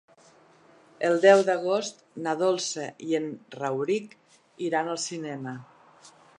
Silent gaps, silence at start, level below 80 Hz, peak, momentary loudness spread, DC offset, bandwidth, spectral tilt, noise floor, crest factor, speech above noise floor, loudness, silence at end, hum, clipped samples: none; 1 s; -82 dBFS; -4 dBFS; 17 LU; under 0.1%; 11 kHz; -4 dB/octave; -57 dBFS; 22 dB; 31 dB; -26 LUFS; 0.3 s; none; under 0.1%